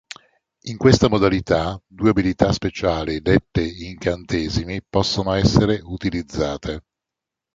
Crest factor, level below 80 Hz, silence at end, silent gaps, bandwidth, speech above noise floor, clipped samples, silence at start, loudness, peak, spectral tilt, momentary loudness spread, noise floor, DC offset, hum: 18 dB; -36 dBFS; 0.75 s; none; 7.8 kHz; 66 dB; under 0.1%; 0.65 s; -20 LUFS; -2 dBFS; -6 dB/octave; 12 LU; -86 dBFS; under 0.1%; none